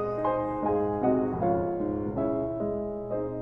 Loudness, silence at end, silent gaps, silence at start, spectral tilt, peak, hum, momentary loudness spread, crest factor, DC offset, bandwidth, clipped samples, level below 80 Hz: -29 LUFS; 0 s; none; 0 s; -11 dB/octave; -14 dBFS; none; 6 LU; 14 dB; under 0.1%; 5.2 kHz; under 0.1%; -50 dBFS